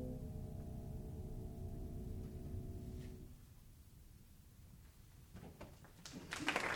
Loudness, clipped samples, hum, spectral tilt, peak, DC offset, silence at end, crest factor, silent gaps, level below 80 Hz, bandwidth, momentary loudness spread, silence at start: -49 LUFS; under 0.1%; none; -5 dB/octave; -20 dBFS; under 0.1%; 0 s; 28 dB; none; -56 dBFS; over 20 kHz; 15 LU; 0 s